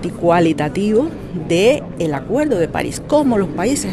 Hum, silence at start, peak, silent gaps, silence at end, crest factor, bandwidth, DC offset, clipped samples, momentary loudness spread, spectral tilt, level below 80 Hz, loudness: none; 0 s; -2 dBFS; none; 0 s; 14 dB; 12.5 kHz; under 0.1%; under 0.1%; 7 LU; -5.5 dB/octave; -40 dBFS; -17 LUFS